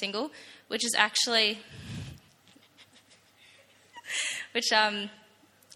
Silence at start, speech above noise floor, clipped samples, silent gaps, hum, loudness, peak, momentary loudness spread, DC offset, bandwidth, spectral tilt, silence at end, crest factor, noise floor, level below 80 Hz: 0 s; 32 dB; under 0.1%; none; none; -27 LUFS; -6 dBFS; 19 LU; under 0.1%; 16.5 kHz; -1 dB/octave; 0.6 s; 26 dB; -61 dBFS; -66 dBFS